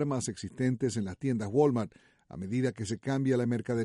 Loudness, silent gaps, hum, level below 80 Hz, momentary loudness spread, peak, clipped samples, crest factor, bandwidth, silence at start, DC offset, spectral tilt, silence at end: -31 LUFS; none; none; -64 dBFS; 10 LU; -14 dBFS; under 0.1%; 18 dB; 11.5 kHz; 0 s; under 0.1%; -6.5 dB/octave; 0 s